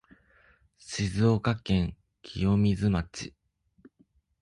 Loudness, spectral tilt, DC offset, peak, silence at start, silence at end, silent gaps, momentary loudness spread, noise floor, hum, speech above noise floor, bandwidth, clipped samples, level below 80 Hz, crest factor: -28 LUFS; -6.5 dB/octave; under 0.1%; -12 dBFS; 0.85 s; 1.15 s; none; 16 LU; -67 dBFS; none; 40 dB; 11 kHz; under 0.1%; -46 dBFS; 18 dB